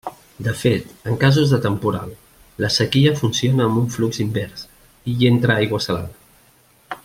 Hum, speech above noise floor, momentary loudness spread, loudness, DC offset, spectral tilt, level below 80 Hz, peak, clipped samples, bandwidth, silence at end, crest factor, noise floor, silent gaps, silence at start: none; 36 dB; 16 LU; -19 LUFS; under 0.1%; -5.5 dB/octave; -50 dBFS; -2 dBFS; under 0.1%; 16 kHz; 0.05 s; 18 dB; -54 dBFS; none; 0.05 s